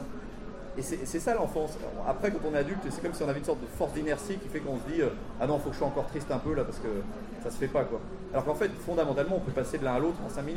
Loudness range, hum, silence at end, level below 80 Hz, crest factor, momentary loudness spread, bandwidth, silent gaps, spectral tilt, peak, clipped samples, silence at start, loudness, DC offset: 2 LU; none; 0 s; -44 dBFS; 16 dB; 8 LU; 16 kHz; none; -6 dB/octave; -14 dBFS; under 0.1%; 0 s; -32 LUFS; under 0.1%